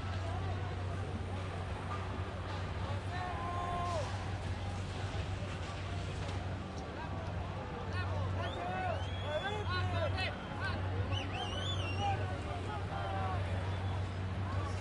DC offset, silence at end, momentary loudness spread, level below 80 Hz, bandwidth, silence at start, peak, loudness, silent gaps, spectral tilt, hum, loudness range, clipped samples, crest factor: under 0.1%; 0 s; 5 LU; -50 dBFS; 11 kHz; 0 s; -24 dBFS; -38 LUFS; none; -6 dB/octave; none; 4 LU; under 0.1%; 14 dB